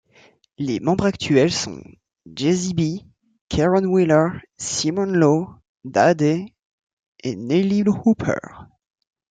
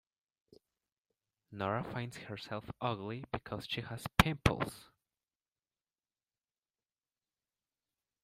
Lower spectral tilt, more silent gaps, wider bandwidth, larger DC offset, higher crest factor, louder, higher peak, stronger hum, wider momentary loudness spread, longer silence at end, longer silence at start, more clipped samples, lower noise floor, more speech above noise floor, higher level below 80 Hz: about the same, -5.5 dB/octave vs -5 dB/octave; first, 3.41-3.48 s, 5.69-5.75 s, 6.62-6.87 s, 6.93-7.12 s vs none; second, 9.4 kHz vs 15.5 kHz; neither; second, 18 dB vs 38 dB; first, -20 LUFS vs -37 LUFS; about the same, -4 dBFS vs -2 dBFS; neither; about the same, 14 LU vs 13 LU; second, 0.65 s vs 3.4 s; second, 0.6 s vs 1.5 s; neither; second, -55 dBFS vs under -90 dBFS; second, 35 dB vs over 53 dB; about the same, -50 dBFS vs -54 dBFS